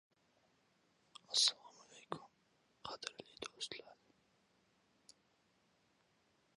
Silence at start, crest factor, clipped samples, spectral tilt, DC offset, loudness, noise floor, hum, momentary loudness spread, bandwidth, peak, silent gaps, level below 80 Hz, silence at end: 1.3 s; 32 dB; under 0.1%; 0 dB/octave; under 0.1%; -40 LUFS; -77 dBFS; none; 26 LU; 11 kHz; -16 dBFS; none; -86 dBFS; 2.65 s